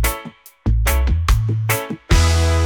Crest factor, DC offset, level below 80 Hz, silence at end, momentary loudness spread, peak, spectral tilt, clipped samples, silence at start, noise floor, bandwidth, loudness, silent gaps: 12 dB; under 0.1%; -20 dBFS; 0 s; 10 LU; -4 dBFS; -4.5 dB/octave; under 0.1%; 0 s; -37 dBFS; 19.5 kHz; -18 LUFS; none